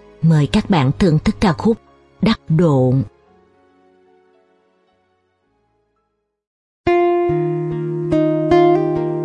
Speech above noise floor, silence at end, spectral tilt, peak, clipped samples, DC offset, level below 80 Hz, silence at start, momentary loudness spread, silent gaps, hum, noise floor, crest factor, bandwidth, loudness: 56 dB; 0 s; -8 dB/octave; -2 dBFS; under 0.1%; under 0.1%; -40 dBFS; 0.2 s; 8 LU; 6.47-6.84 s; none; -70 dBFS; 16 dB; 11 kHz; -16 LUFS